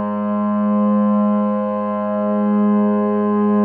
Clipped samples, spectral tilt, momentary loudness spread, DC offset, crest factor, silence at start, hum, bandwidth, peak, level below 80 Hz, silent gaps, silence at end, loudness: under 0.1%; -14 dB/octave; 5 LU; under 0.1%; 10 dB; 0 s; none; 3.2 kHz; -8 dBFS; -78 dBFS; none; 0 s; -18 LUFS